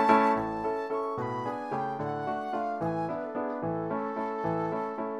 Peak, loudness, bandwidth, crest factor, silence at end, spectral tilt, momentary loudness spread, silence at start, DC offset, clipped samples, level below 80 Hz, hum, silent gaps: -8 dBFS; -31 LUFS; 12 kHz; 22 dB; 0 s; -7.5 dB/octave; 5 LU; 0 s; under 0.1%; under 0.1%; -62 dBFS; none; none